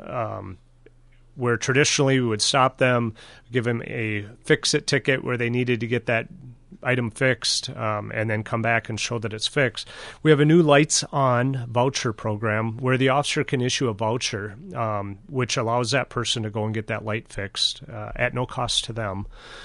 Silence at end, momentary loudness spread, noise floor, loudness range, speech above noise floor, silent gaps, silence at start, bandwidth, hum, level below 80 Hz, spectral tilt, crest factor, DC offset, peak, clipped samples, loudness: 0 s; 11 LU; -52 dBFS; 5 LU; 29 dB; none; 0 s; 11.5 kHz; none; -50 dBFS; -4 dB/octave; 20 dB; under 0.1%; -4 dBFS; under 0.1%; -23 LUFS